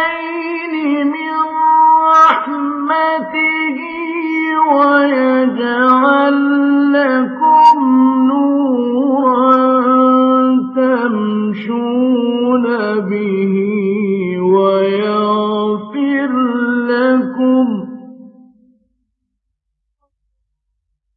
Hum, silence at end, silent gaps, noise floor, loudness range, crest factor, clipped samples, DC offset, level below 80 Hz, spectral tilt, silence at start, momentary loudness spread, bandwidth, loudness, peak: none; 2.9 s; none; -73 dBFS; 5 LU; 12 dB; under 0.1%; under 0.1%; -66 dBFS; -7.5 dB/octave; 0 s; 9 LU; 6.4 kHz; -13 LUFS; 0 dBFS